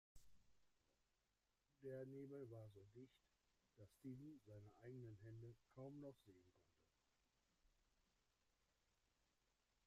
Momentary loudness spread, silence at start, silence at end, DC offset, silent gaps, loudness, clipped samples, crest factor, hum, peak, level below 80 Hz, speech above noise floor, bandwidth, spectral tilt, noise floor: 8 LU; 0.15 s; 2.05 s; under 0.1%; none; -60 LUFS; under 0.1%; 18 dB; none; -46 dBFS; -84 dBFS; 30 dB; 11.5 kHz; -8 dB/octave; -89 dBFS